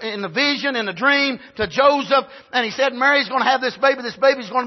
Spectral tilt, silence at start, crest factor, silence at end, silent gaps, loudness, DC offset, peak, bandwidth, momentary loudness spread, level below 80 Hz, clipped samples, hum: -3.5 dB/octave; 0 s; 16 dB; 0 s; none; -18 LUFS; under 0.1%; -2 dBFS; 6.2 kHz; 6 LU; -56 dBFS; under 0.1%; none